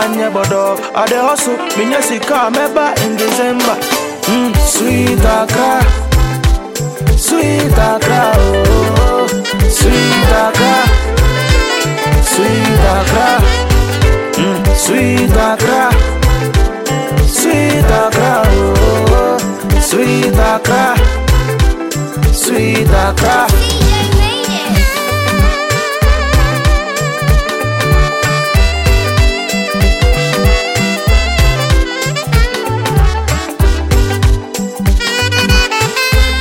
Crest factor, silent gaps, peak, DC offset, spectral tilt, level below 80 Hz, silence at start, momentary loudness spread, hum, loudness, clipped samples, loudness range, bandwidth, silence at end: 10 dB; none; 0 dBFS; under 0.1%; -4.5 dB/octave; -14 dBFS; 0 s; 4 LU; none; -11 LUFS; under 0.1%; 2 LU; 17 kHz; 0 s